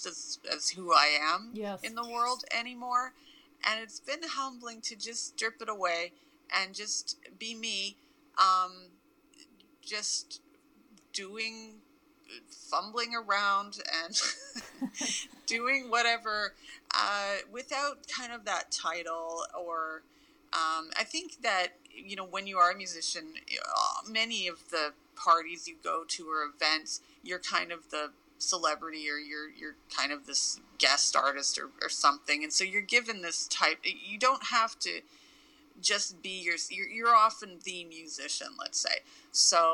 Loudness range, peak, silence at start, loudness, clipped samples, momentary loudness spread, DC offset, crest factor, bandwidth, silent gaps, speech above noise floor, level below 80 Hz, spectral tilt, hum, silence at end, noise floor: 6 LU; -8 dBFS; 0 s; -31 LUFS; under 0.1%; 14 LU; under 0.1%; 26 dB; 19 kHz; none; 30 dB; -76 dBFS; 0.5 dB/octave; none; 0 s; -63 dBFS